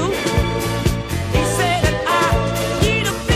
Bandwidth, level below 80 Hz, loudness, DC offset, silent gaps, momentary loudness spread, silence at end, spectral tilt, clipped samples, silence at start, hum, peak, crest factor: 16 kHz; -26 dBFS; -18 LUFS; under 0.1%; none; 4 LU; 0 s; -4.5 dB/octave; under 0.1%; 0 s; none; -2 dBFS; 16 dB